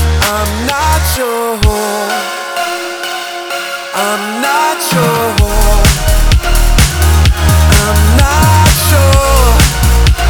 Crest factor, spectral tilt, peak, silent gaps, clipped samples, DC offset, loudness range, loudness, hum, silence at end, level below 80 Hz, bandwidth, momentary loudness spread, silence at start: 10 dB; -4 dB/octave; 0 dBFS; none; under 0.1%; 1%; 6 LU; -11 LUFS; none; 0 s; -12 dBFS; over 20 kHz; 9 LU; 0 s